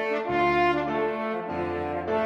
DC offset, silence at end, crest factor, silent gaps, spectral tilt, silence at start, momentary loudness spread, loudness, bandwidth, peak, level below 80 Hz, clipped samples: under 0.1%; 0 s; 14 dB; none; -7 dB/octave; 0 s; 8 LU; -26 LUFS; 7.8 kHz; -12 dBFS; -52 dBFS; under 0.1%